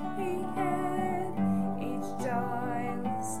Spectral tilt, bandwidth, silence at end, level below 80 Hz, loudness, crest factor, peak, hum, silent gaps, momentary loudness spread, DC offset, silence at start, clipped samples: -6.5 dB/octave; 14.5 kHz; 0 s; -62 dBFS; -32 LUFS; 14 dB; -18 dBFS; none; none; 4 LU; 1%; 0 s; under 0.1%